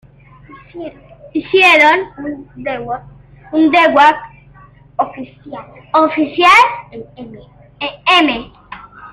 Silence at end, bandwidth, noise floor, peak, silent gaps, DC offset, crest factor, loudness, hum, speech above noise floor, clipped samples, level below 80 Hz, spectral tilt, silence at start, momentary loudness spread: 0.05 s; 14.5 kHz; -42 dBFS; 0 dBFS; none; under 0.1%; 16 dB; -12 LUFS; none; 29 dB; under 0.1%; -48 dBFS; -3.5 dB/octave; 0.55 s; 25 LU